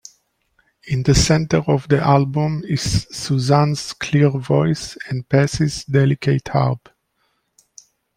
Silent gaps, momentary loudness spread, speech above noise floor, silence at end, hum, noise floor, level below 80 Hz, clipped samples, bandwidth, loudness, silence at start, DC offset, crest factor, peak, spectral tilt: none; 7 LU; 50 dB; 1.4 s; none; -68 dBFS; -38 dBFS; under 0.1%; 12 kHz; -18 LUFS; 0.85 s; under 0.1%; 16 dB; -2 dBFS; -6 dB/octave